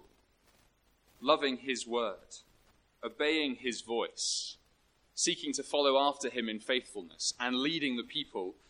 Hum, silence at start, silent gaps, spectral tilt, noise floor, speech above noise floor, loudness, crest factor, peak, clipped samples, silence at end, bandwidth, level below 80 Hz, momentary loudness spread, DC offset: none; 1.2 s; none; -1.5 dB/octave; -70 dBFS; 36 dB; -33 LUFS; 24 dB; -12 dBFS; under 0.1%; 0.15 s; 11.5 kHz; -72 dBFS; 15 LU; under 0.1%